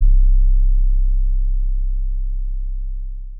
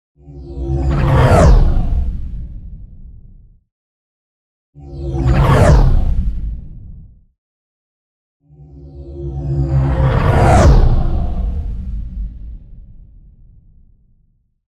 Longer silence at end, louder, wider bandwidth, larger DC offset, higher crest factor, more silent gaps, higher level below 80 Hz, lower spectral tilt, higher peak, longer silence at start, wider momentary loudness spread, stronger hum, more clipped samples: second, 0 s vs 1.95 s; second, -23 LUFS vs -15 LUFS; second, 0.3 kHz vs 11.5 kHz; neither; about the same, 10 dB vs 14 dB; second, none vs 3.72-4.73 s, 7.38-8.40 s; about the same, -14 dBFS vs -18 dBFS; first, -20 dB/octave vs -7.5 dB/octave; about the same, -4 dBFS vs -2 dBFS; second, 0 s vs 0.3 s; second, 11 LU vs 25 LU; neither; neither